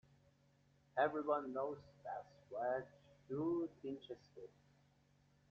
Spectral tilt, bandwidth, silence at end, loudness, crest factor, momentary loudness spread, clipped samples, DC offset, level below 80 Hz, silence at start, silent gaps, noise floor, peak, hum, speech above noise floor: -5 dB/octave; 7.2 kHz; 1.05 s; -43 LUFS; 20 dB; 17 LU; under 0.1%; under 0.1%; -82 dBFS; 0.95 s; none; -74 dBFS; -24 dBFS; none; 31 dB